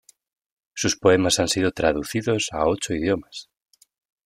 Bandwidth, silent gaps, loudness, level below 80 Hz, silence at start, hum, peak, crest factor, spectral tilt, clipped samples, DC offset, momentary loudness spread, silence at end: 16 kHz; none; -22 LUFS; -50 dBFS; 0.75 s; none; -4 dBFS; 20 dB; -4 dB/octave; under 0.1%; under 0.1%; 10 LU; 0.85 s